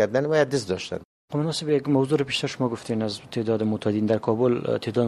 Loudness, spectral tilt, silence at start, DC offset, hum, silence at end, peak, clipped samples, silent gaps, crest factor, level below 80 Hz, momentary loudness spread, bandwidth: -25 LUFS; -6 dB/octave; 0 s; under 0.1%; none; 0 s; -8 dBFS; under 0.1%; 1.05-1.28 s; 16 dB; -62 dBFS; 7 LU; 12.5 kHz